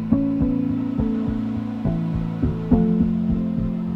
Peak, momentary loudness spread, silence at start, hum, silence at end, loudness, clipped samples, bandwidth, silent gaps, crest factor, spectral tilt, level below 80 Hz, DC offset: -4 dBFS; 5 LU; 0 s; none; 0 s; -22 LUFS; under 0.1%; 5.2 kHz; none; 16 dB; -11 dB/octave; -34 dBFS; under 0.1%